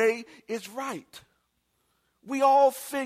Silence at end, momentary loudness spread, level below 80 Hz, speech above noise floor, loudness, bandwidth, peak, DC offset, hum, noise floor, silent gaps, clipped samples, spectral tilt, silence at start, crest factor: 0 s; 16 LU; -78 dBFS; 48 dB; -26 LUFS; 16 kHz; -10 dBFS; under 0.1%; none; -74 dBFS; none; under 0.1%; -3.5 dB/octave; 0 s; 18 dB